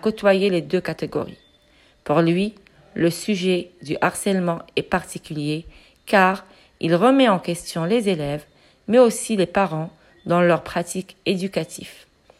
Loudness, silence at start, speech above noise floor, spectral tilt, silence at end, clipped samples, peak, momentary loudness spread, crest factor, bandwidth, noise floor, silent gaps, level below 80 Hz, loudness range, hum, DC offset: -21 LUFS; 0.05 s; 36 dB; -5.5 dB/octave; 0.45 s; under 0.1%; -2 dBFS; 15 LU; 18 dB; 15.5 kHz; -56 dBFS; none; -54 dBFS; 4 LU; none; under 0.1%